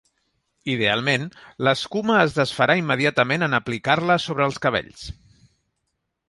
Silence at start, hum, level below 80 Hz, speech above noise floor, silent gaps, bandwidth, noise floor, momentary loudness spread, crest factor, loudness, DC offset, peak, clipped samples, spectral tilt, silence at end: 0.65 s; none; -54 dBFS; 55 dB; none; 11.5 kHz; -77 dBFS; 11 LU; 20 dB; -21 LUFS; under 0.1%; -2 dBFS; under 0.1%; -5 dB/octave; 1.15 s